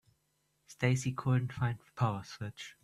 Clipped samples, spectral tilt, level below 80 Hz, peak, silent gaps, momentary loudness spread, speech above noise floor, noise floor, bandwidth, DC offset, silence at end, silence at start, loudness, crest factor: under 0.1%; -6 dB/octave; -64 dBFS; -14 dBFS; none; 12 LU; 44 dB; -78 dBFS; 12 kHz; under 0.1%; 0.1 s; 0.7 s; -34 LUFS; 20 dB